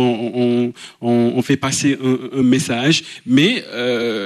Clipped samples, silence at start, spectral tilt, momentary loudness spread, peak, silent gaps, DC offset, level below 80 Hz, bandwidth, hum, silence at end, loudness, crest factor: under 0.1%; 0 s; -4.5 dB/octave; 5 LU; -2 dBFS; none; under 0.1%; -62 dBFS; 13.5 kHz; none; 0 s; -17 LUFS; 14 dB